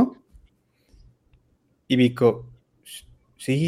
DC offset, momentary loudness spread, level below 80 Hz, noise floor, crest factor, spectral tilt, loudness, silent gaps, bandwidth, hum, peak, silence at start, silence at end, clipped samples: under 0.1%; 23 LU; -58 dBFS; -66 dBFS; 20 dB; -6.5 dB/octave; -23 LUFS; none; 15 kHz; none; -6 dBFS; 0 s; 0 s; under 0.1%